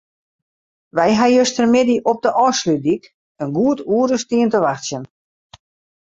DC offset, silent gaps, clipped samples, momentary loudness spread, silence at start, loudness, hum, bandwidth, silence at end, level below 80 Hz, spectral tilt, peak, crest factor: under 0.1%; 3.14-3.35 s; under 0.1%; 11 LU; 0.95 s; -17 LUFS; none; 7.8 kHz; 1 s; -58 dBFS; -4.5 dB/octave; -2 dBFS; 16 dB